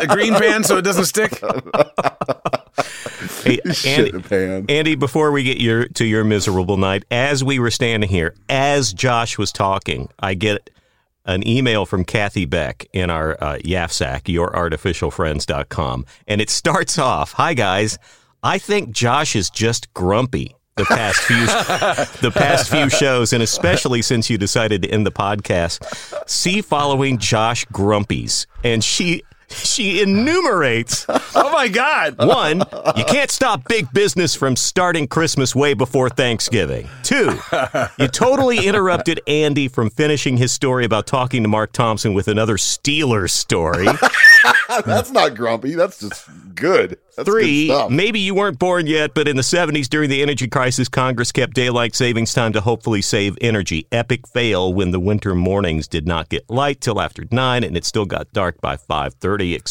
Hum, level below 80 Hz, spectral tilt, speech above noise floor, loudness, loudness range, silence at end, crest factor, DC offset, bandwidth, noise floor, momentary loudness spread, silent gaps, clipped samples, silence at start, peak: none; -42 dBFS; -4 dB/octave; 41 dB; -17 LUFS; 6 LU; 0 s; 18 dB; 0.9%; 17 kHz; -58 dBFS; 7 LU; none; under 0.1%; 0 s; 0 dBFS